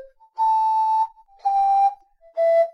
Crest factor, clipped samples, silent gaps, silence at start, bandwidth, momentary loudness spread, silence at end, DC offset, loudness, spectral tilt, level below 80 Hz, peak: 10 dB; under 0.1%; none; 0 s; 10.5 kHz; 9 LU; 0.05 s; under 0.1%; -21 LUFS; -0.5 dB/octave; -64 dBFS; -10 dBFS